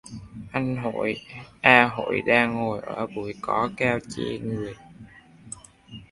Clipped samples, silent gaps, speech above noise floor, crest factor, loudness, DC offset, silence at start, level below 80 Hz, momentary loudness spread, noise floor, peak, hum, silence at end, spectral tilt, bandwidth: under 0.1%; none; 24 dB; 26 dB; -24 LUFS; under 0.1%; 0.05 s; -56 dBFS; 24 LU; -48 dBFS; 0 dBFS; none; 0.05 s; -5.5 dB/octave; 11.5 kHz